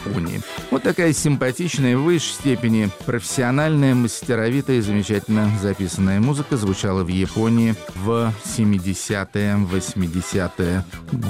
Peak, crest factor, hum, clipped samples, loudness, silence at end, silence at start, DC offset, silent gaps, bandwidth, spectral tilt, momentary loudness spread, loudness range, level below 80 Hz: -8 dBFS; 12 dB; none; under 0.1%; -20 LUFS; 0 s; 0 s; 0.1%; none; 16 kHz; -5.5 dB/octave; 6 LU; 2 LU; -46 dBFS